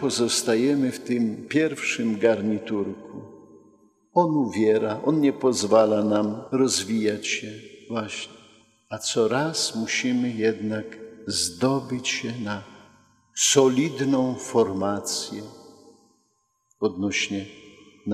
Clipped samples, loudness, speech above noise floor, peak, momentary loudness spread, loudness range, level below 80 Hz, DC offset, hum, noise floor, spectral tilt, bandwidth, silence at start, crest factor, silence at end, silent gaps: under 0.1%; -24 LUFS; 47 dB; -4 dBFS; 14 LU; 5 LU; -68 dBFS; under 0.1%; none; -71 dBFS; -4 dB/octave; 15.5 kHz; 0 s; 20 dB; 0 s; none